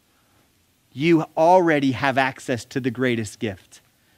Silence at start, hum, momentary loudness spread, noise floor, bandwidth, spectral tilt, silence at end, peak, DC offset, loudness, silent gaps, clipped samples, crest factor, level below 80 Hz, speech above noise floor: 0.95 s; none; 14 LU; -62 dBFS; 15.5 kHz; -6 dB/octave; 0.6 s; -2 dBFS; under 0.1%; -21 LUFS; none; under 0.1%; 20 dB; -62 dBFS; 42 dB